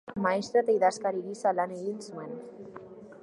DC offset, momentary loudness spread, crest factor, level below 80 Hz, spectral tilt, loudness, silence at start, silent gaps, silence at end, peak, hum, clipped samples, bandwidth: under 0.1%; 20 LU; 18 dB; -72 dBFS; -5 dB/octave; -29 LUFS; 0.05 s; none; 0.05 s; -12 dBFS; none; under 0.1%; 11.5 kHz